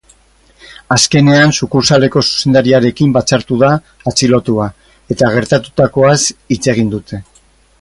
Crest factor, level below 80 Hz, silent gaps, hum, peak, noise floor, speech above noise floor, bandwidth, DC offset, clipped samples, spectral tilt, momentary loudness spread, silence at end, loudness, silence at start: 12 dB; -42 dBFS; none; none; 0 dBFS; -49 dBFS; 38 dB; 11.5 kHz; under 0.1%; under 0.1%; -4.5 dB/octave; 8 LU; 0.6 s; -11 LUFS; 0.7 s